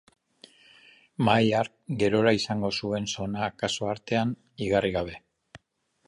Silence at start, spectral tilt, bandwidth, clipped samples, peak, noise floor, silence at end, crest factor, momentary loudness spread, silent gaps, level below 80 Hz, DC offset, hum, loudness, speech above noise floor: 1.2 s; -5.5 dB/octave; 11.5 kHz; under 0.1%; -6 dBFS; -72 dBFS; 0.5 s; 22 dB; 10 LU; none; -56 dBFS; under 0.1%; none; -27 LUFS; 45 dB